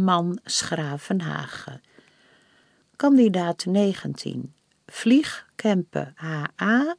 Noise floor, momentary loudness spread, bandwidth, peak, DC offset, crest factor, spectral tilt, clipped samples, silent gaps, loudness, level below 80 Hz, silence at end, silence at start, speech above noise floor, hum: -61 dBFS; 16 LU; 10.5 kHz; -6 dBFS; under 0.1%; 18 dB; -5 dB/octave; under 0.1%; none; -24 LUFS; -68 dBFS; 0.05 s; 0 s; 38 dB; none